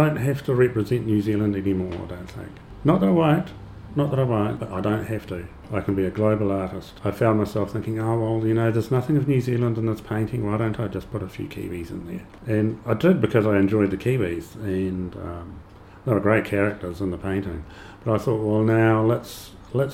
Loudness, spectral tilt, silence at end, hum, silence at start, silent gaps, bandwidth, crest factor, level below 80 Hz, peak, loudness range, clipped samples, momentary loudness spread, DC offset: -23 LUFS; -8.5 dB/octave; 0 s; none; 0 s; none; 15.5 kHz; 18 dB; -46 dBFS; -4 dBFS; 3 LU; under 0.1%; 15 LU; under 0.1%